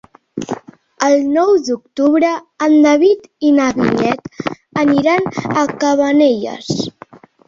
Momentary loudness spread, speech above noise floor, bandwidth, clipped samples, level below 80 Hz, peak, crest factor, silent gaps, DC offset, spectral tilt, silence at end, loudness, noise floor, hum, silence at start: 14 LU; 27 dB; 7.6 kHz; under 0.1%; -54 dBFS; 0 dBFS; 14 dB; none; under 0.1%; -5.5 dB/octave; 0.3 s; -14 LUFS; -41 dBFS; none; 0.35 s